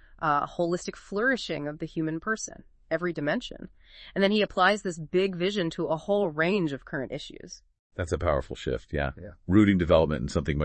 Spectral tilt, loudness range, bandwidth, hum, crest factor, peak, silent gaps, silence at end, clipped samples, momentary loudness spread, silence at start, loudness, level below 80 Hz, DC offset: -5.5 dB/octave; 4 LU; 8.8 kHz; none; 20 dB; -8 dBFS; 7.79-7.90 s; 0 s; under 0.1%; 16 LU; 0.1 s; -27 LUFS; -46 dBFS; under 0.1%